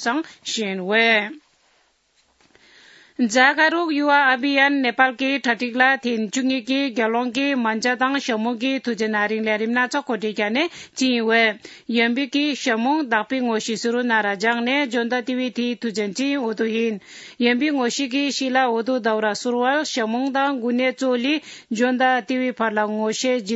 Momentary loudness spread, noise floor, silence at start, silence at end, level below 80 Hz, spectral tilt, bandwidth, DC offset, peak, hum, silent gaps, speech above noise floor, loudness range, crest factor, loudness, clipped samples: 7 LU; -63 dBFS; 0 s; 0 s; -74 dBFS; -3 dB/octave; 8 kHz; under 0.1%; -2 dBFS; none; none; 43 dB; 4 LU; 20 dB; -20 LUFS; under 0.1%